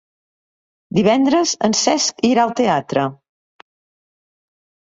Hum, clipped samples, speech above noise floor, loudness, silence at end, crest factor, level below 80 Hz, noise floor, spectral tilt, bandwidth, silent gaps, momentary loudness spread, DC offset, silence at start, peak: none; under 0.1%; over 74 dB; -17 LUFS; 1.8 s; 18 dB; -58 dBFS; under -90 dBFS; -4 dB/octave; 8 kHz; none; 7 LU; under 0.1%; 0.9 s; -2 dBFS